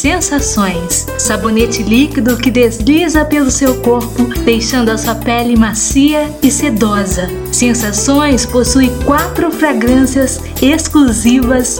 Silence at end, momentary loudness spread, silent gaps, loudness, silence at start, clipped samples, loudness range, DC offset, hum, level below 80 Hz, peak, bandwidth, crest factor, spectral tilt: 0 s; 4 LU; none; -11 LUFS; 0 s; under 0.1%; 1 LU; under 0.1%; none; -24 dBFS; 0 dBFS; over 20 kHz; 10 dB; -4 dB/octave